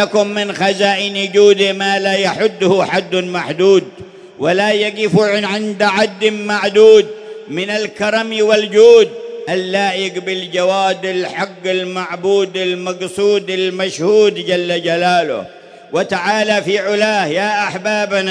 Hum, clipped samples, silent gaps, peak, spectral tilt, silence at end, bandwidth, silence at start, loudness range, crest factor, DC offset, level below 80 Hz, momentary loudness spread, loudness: none; under 0.1%; none; 0 dBFS; -4.5 dB/octave; 0 s; 10.5 kHz; 0 s; 5 LU; 14 dB; under 0.1%; -62 dBFS; 10 LU; -14 LUFS